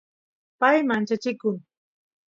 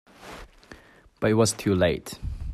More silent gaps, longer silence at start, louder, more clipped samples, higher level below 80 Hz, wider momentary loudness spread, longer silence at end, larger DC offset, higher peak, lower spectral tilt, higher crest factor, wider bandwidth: neither; first, 0.6 s vs 0.2 s; about the same, -23 LUFS vs -24 LUFS; neither; second, -76 dBFS vs -42 dBFS; second, 9 LU vs 22 LU; first, 0.75 s vs 0 s; neither; about the same, -6 dBFS vs -8 dBFS; about the same, -6 dB/octave vs -5 dB/octave; about the same, 20 dB vs 18 dB; second, 7.6 kHz vs 14.5 kHz